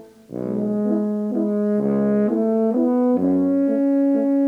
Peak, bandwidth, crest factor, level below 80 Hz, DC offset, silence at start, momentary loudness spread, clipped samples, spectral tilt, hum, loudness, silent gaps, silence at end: -10 dBFS; 2.9 kHz; 10 dB; -64 dBFS; under 0.1%; 0 s; 5 LU; under 0.1%; -10.5 dB/octave; none; -20 LUFS; none; 0 s